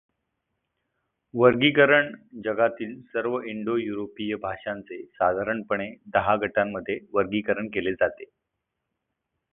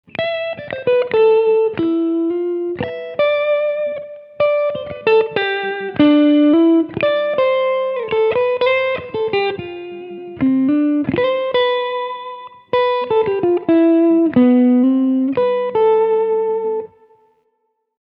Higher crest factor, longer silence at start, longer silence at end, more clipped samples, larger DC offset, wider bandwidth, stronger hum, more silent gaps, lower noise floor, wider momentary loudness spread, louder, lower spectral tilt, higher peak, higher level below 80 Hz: first, 22 dB vs 14 dB; first, 1.35 s vs 0.2 s; about the same, 1.25 s vs 1.15 s; neither; neither; second, 3.9 kHz vs 5.2 kHz; neither; neither; first, -82 dBFS vs -68 dBFS; first, 15 LU vs 12 LU; second, -25 LUFS vs -16 LUFS; about the same, -9.5 dB/octave vs -8.5 dB/octave; about the same, -4 dBFS vs -2 dBFS; about the same, -60 dBFS vs -58 dBFS